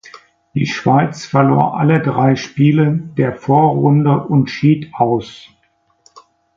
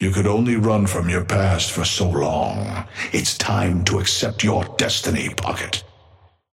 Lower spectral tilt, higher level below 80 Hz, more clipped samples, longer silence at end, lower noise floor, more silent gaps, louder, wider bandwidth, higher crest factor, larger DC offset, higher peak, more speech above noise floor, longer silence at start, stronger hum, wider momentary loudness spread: first, -8 dB/octave vs -4.5 dB/octave; second, -52 dBFS vs -42 dBFS; neither; first, 1.2 s vs 0.7 s; about the same, -55 dBFS vs -53 dBFS; neither; first, -14 LUFS vs -20 LUFS; second, 7.4 kHz vs 16 kHz; about the same, 14 dB vs 18 dB; neither; first, 0 dBFS vs -4 dBFS; first, 41 dB vs 33 dB; first, 0.55 s vs 0 s; neither; about the same, 7 LU vs 6 LU